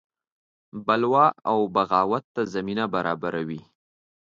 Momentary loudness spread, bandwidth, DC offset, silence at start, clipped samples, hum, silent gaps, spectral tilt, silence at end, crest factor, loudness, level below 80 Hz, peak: 12 LU; 7.6 kHz; under 0.1%; 0.75 s; under 0.1%; none; 2.24-2.35 s; -7 dB/octave; 0.65 s; 20 dB; -24 LUFS; -64 dBFS; -6 dBFS